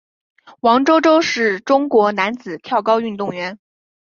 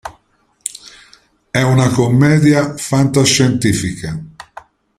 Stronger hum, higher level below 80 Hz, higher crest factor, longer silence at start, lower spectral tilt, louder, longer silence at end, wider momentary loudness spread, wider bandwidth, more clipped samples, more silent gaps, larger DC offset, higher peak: neither; second, -66 dBFS vs -44 dBFS; about the same, 16 dB vs 16 dB; first, 0.65 s vs 0.05 s; about the same, -4.5 dB/octave vs -5 dB/octave; second, -16 LUFS vs -13 LUFS; about the same, 0.5 s vs 0.55 s; second, 11 LU vs 17 LU; second, 7.2 kHz vs 15 kHz; neither; neither; neither; about the same, -2 dBFS vs 0 dBFS